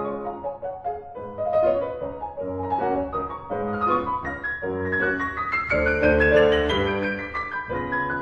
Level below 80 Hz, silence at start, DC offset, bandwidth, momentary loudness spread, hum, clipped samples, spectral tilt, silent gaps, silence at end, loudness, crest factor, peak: -40 dBFS; 0 s; under 0.1%; 7.4 kHz; 13 LU; none; under 0.1%; -7 dB/octave; none; 0 s; -24 LUFS; 20 dB; -4 dBFS